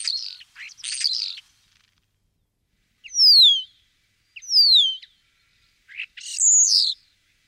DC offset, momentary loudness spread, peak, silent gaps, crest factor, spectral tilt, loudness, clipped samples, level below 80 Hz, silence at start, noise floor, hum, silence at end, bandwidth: under 0.1%; 22 LU; -8 dBFS; none; 16 dB; 7.5 dB/octave; -15 LUFS; under 0.1%; -74 dBFS; 0 s; -71 dBFS; none; 0.55 s; 16 kHz